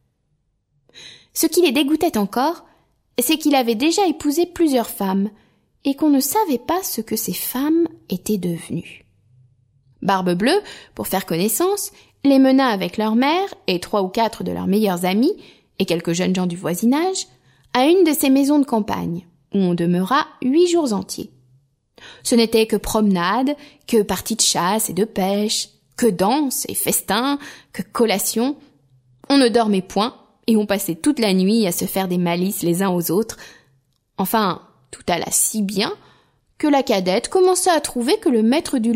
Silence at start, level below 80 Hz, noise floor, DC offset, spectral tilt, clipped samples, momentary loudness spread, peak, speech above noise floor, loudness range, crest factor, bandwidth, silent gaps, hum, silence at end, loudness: 0.95 s; -52 dBFS; -68 dBFS; under 0.1%; -4.5 dB/octave; under 0.1%; 11 LU; -2 dBFS; 49 dB; 4 LU; 18 dB; 16 kHz; none; none; 0 s; -19 LUFS